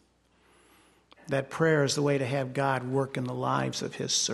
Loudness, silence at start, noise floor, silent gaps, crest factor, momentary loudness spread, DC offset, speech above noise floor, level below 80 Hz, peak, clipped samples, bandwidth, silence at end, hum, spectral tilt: -28 LUFS; 1.25 s; -65 dBFS; none; 18 dB; 7 LU; under 0.1%; 37 dB; -68 dBFS; -12 dBFS; under 0.1%; 12.5 kHz; 0 s; none; -4 dB/octave